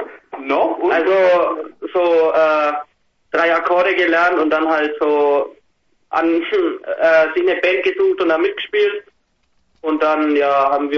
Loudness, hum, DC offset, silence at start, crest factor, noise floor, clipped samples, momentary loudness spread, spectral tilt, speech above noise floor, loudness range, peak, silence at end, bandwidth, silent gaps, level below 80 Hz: -16 LUFS; none; under 0.1%; 0 s; 14 dB; -63 dBFS; under 0.1%; 9 LU; -5 dB/octave; 47 dB; 1 LU; -2 dBFS; 0 s; 7 kHz; none; -60 dBFS